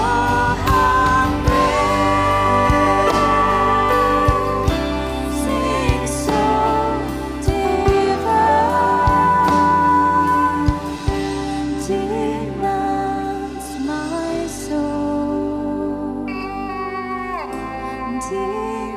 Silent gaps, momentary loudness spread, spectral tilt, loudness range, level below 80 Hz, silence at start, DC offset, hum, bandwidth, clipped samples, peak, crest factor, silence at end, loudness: none; 11 LU; -5.5 dB/octave; 8 LU; -30 dBFS; 0 s; under 0.1%; none; 16 kHz; under 0.1%; -4 dBFS; 14 dB; 0 s; -18 LUFS